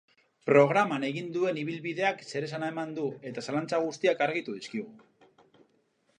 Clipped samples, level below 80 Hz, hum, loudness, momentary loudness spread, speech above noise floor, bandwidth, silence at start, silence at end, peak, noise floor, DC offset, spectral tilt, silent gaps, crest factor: under 0.1%; -80 dBFS; none; -29 LUFS; 14 LU; 42 dB; 10 kHz; 0.45 s; 1.2 s; -8 dBFS; -71 dBFS; under 0.1%; -5.5 dB/octave; none; 22 dB